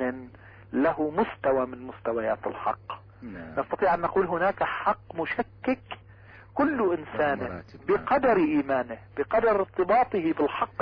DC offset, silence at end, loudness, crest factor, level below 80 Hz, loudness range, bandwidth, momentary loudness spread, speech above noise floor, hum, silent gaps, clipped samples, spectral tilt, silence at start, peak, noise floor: under 0.1%; 0 s; -27 LUFS; 14 dB; -56 dBFS; 4 LU; 5.2 kHz; 13 LU; 24 dB; none; none; under 0.1%; -9 dB/octave; 0 s; -14 dBFS; -50 dBFS